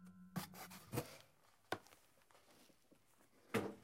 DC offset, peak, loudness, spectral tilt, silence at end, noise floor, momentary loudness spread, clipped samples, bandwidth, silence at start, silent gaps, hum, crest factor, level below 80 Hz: under 0.1%; -24 dBFS; -49 LUFS; -5 dB/octave; 0 s; -74 dBFS; 24 LU; under 0.1%; 16 kHz; 0 s; none; none; 26 dB; -76 dBFS